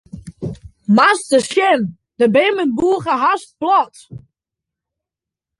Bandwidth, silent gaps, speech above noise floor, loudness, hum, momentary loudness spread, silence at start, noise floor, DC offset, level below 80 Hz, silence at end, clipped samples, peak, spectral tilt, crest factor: 11.5 kHz; none; 71 dB; -15 LUFS; none; 17 LU; 0.15 s; -86 dBFS; under 0.1%; -52 dBFS; 1.4 s; under 0.1%; -2 dBFS; -5 dB/octave; 16 dB